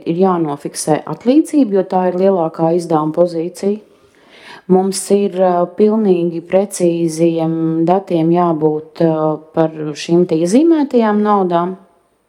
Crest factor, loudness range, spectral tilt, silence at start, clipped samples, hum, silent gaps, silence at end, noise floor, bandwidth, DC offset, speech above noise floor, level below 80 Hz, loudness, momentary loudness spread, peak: 14 dB; 2 LU; -6.5 dB/octave; 0 s; under 0.1%; none; none; 0.5 s; -46 dBFS; 14.5 kHz; under 0.1%; 32 dB; -66 dBFS; -15 LUFS; 6 LU; 0 dBFS